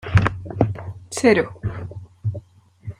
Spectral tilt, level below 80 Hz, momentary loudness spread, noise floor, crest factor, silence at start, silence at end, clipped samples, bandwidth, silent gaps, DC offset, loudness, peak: -6.5 dB/octave; -40 dBFS; 18 LU; -43 dBFS; 20 dB; 0.05 s; 0.05 s; under 0.1%; 12 kHz; none; under 0.1%; -22 LUFS; -2 dBFS